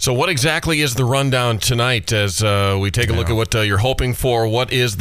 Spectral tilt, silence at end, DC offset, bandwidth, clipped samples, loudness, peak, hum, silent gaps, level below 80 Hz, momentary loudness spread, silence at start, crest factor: -4.5 dB/octave; 0 s; 0.3%; 16 kHz; under 0.1%; -17 LUFS; -2 dBFS; none; none; -32 dBFS; 2 LU; 0 s; 14 dB